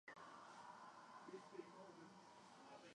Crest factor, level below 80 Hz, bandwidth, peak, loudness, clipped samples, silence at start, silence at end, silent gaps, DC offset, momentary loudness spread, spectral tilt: 18 dB; under -90 dBFS; 10.5 kHz; -42 dBFS; -61 LUFS; under 0.1%; 0.05 s; 0 s; none; under 0.1%; 6 LU; -4 dB/octave